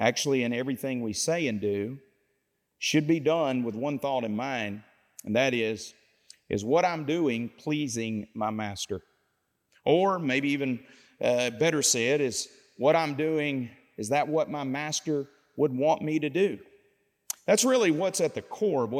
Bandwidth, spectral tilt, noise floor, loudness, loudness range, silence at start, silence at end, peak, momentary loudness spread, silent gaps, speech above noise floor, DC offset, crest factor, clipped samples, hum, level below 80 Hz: 16.5 kHz; -4 dB/octave; -76 dBFS; -28 LUFS; 3 LU; 0 s; 0 s; -8 dBFS; 11 LU; none; 49 dB; under 0.1%; 20 dB; under 0.1%; none; -72 dBFS